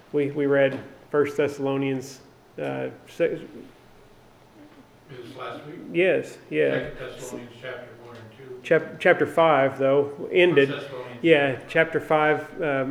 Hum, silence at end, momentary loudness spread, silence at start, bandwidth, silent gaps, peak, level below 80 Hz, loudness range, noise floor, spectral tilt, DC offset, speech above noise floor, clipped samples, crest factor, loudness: none; 0 s; 19 LU; 0.15 s; 14 kHz; none; -2 dBFS; -60 dBFS; 12 LU; -52 dBFS; -6 dB/octave; under 0.1%; 29 dB; under 0.1%; 22 dB; -23 LUFS